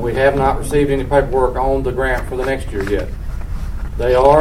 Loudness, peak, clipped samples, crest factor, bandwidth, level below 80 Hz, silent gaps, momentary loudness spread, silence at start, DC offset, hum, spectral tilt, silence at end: -17 LUFS; 0 dBFS; under 0.1%; 16 dB; 16 kHz; -24 dBFS; none; 13 LU; 0 s; under 0.1%; none; -6.5 dB/octave; 0 s